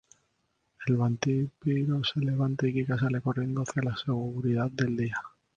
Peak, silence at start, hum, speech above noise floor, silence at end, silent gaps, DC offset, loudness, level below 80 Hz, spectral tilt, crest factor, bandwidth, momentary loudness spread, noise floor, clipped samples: -10 dBFS; 0.8 s; none; 47 dB; 0.3 s; none; under 0.1%; -29 LUFS; -60 dBFS; -7 dB/octave; 20 dB; 7.6 kHz; 4 LU; -75 dBFS; under 0.1%